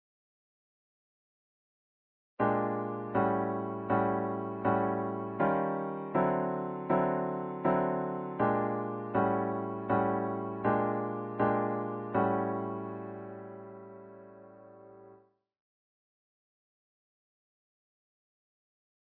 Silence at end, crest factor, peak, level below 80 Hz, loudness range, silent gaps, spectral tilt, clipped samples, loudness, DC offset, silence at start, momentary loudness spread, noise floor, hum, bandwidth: 4 s; 20 dB; -14 dBFS; -68 dBFS; 7 LU; none; -11.5 dB/octave; under 0.1%; -32 LUFS; under 0.1%; 2.4 s; 13 LU; -62 dBFS; none; 4.2 kHz